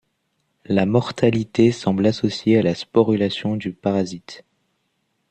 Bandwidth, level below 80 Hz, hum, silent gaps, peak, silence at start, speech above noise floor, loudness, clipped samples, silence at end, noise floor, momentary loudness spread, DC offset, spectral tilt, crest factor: 9 kHz; -56 dBFS; none; none; -2 dBFS; 0.7 s; 52 dB; -20 LUFS; under 0.1%; 0.9 s; -71 dBFS; 7 LU; under 0.1%; -7 dB/octave; 18 dB